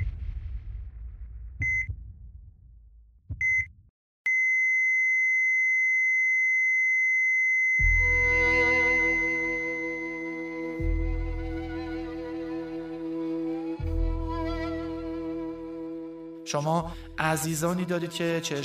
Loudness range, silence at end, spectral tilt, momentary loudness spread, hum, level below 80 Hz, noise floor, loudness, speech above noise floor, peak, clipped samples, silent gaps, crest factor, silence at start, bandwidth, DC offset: 12 LU; 0 s; -4.5 dB/octave; 17 LU; none; -38 dBFS; -54 dBFS; -25 LUFS; 26 dB; -8 dBFS; under 0.1%; 3.90-4.25 s; 18 dB; 0 s; 15.5 kHz; under 0.1%